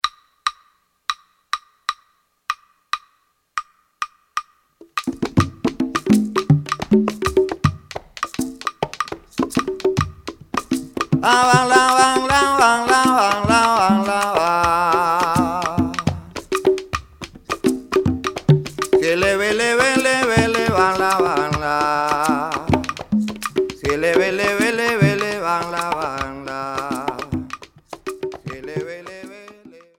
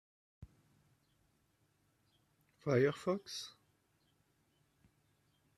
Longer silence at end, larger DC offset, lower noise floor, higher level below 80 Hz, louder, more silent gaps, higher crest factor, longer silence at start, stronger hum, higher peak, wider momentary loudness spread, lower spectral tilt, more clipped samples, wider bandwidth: second, 0.3 s vs 2.1 s; neither; second, -64 dBFS vs -77 dBFS; first, -44 dBFS vs -76 dBFS; first, -19 LUFS vs -37 LUFS; neither; about the same, 20 dB vs 24 dB; second, 0.05 s vs 0.4 s; neither; first, 0 dBFS vs -18 dBFS; about the same, 15 LU vs 13 LU; about the same, -5 dB/octave vs -6 dB/octave; neither; first, 17 kHz vs 13.5 kHz